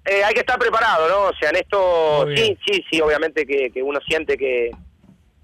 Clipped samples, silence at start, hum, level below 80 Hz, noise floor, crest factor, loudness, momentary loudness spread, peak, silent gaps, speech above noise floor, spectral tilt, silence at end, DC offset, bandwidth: under 0.1%; 0.05 s; none; -48 dBFS; -52 dBFS; 12 dB; -18 LUFS; 5 LU; -8 dBFS; none; 34 dB; -4 dB/octave; 0.55 s; under 0.1%; 14.5 kHz